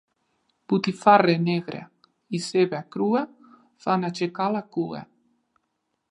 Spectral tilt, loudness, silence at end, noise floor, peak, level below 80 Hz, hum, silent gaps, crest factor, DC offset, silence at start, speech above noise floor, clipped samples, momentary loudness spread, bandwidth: -6 dB/octave; -24 LUFS; 1.05 s; -77 dBFS; -2 dBFS; -74 dBFS; none; none; 22 dB; under 0.1%; 0.7 s; 54 dB; under 0.1%; 15 LU; 11 kHz